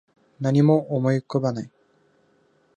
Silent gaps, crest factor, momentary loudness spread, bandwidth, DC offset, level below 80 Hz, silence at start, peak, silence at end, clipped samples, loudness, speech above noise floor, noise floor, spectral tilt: none; 18 dB; 13 LU; 8.8 kHz; under 0.1%; -70 dBFS; 0.4 s; -6 dBFS; 1.1 s; under 0.1%; -22 LUFS; 42 dB; -62 dBFS; -8.5 dB/octave